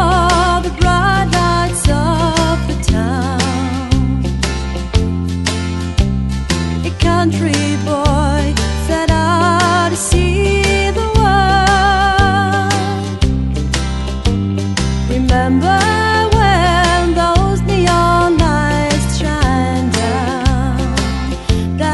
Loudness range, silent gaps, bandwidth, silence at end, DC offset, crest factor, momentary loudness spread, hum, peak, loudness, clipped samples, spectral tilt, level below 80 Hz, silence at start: 4 LU; none; 12 kHz; 0 s; under 0.1%; 14 dB; 6 LU; none; 0 dBFS; -14 LUFS; under 0.1%; -5 dB/octave; -20 dBFS; 0 s